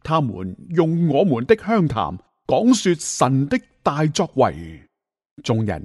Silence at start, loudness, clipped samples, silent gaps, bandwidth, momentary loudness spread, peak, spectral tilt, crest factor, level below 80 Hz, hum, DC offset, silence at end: 0.05 s; -20 LUFS; under 0.1%; 5.31-5.37 s; 11.5 kHz; 11 LU; -2 dBFS; -6 dB/octave; 18 dB; -48 dBFS; none; under 0.1%; 0 s